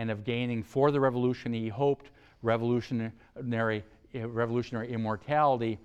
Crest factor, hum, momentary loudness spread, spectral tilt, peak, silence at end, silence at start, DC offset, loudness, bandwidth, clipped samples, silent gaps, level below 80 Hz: 18 dB; none; 10 LU; -8 dB/octave; -12 dBFS; 0.05 s; 0 s; under 0.1%; -30 LUFS; 8.4 kHz; under 0.1%; none; -62 dBFS